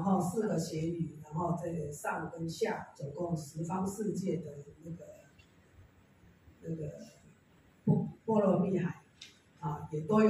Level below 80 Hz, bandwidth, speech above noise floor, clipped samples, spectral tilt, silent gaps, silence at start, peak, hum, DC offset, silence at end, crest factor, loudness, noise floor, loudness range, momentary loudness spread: -68 dBFS; 15 kHz; 30 dB; under 0.1%; -7 dB/octave; none; 0 s; -16 dBFS; none; under 0.1%; 0 s; 20 dB; -35 LUFS; -64 dBFS; 9 LU; 18 LU